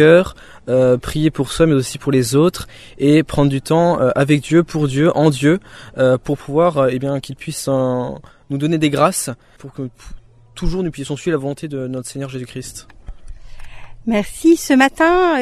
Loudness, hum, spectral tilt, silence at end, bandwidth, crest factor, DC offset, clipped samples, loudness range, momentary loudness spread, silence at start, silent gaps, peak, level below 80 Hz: -16 LUFS; none; -6 dB/octave; 0 s; 14.5 kHz; 16 dB; under 0.1%; under 0.1%; 10 LU; 16 LU; 0 s; none; 0 dBFS; -36 dBFS